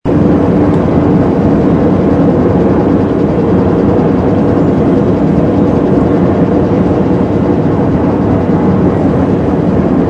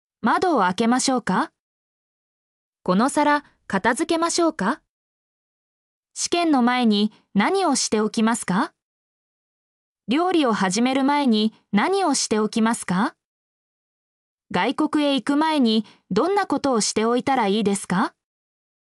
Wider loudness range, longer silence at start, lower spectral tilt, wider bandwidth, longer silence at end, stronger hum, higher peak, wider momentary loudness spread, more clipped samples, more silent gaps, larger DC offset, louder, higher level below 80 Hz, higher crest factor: about the same, 1 LU vs 3 LU; second, 0.05 s vs 0.25 s; first, -10 dB/octave vs -4 dB/octave; second, 7.6 kHz vs 12 kHz; second, 0 s vs 0.85 s; neither; first, 0 dBFS vs -8 dBFS; second, 2 LU vs 6 LU; neither; second, none vs 1.60-2.73 s, 4.89-6.03 s, 8.82-9.95 s, 13.25-14.38 s; neither; first, -10 LUFS vs -21 LUFS; first, -26 dBFS vs -64 dBFS; second, 8 dB vs 14 dB